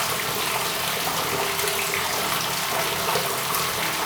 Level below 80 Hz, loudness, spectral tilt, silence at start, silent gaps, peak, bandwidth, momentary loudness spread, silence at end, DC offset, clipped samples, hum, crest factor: -56 dBFS; -23 LUFS; -1.5 dB/octave; 0 s; none; -8 dBFS; over 20 kHz; 1 LU; 0 s; under 0.1%; under 0.1%; none; 18 dB